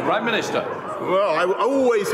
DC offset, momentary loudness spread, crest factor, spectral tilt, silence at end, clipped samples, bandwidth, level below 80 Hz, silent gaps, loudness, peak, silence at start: under 0.1%; 7 LU; 12 dB; -4.5 dB/octave; 0 s; under 0.1%; 16 kHz; -68 dBFS; none; -21 LUFS; -8 dBFS; 0 s